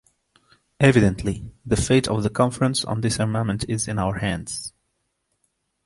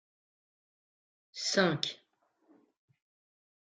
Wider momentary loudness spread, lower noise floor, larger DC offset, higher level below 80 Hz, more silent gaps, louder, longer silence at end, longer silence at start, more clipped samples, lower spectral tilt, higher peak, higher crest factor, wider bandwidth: second, 11 LU vs 21 LU; first, -74 dBFS vs -70 dBFS; neither; first, -42 dBFS vs -78 dBFS; neither; first, -22 LUFS vs -31 LUFS; second, 1.15 s vs 1.65 s; second, 0.8 s vs 1.35 s; neither; first, -5.5 dB/octave vs -3.5 dB/octave; first, -2 dBFS vs -12 dBFS; second, 20 dB vs 26 dB; first, 11.5 kHz vs 9.6 kHz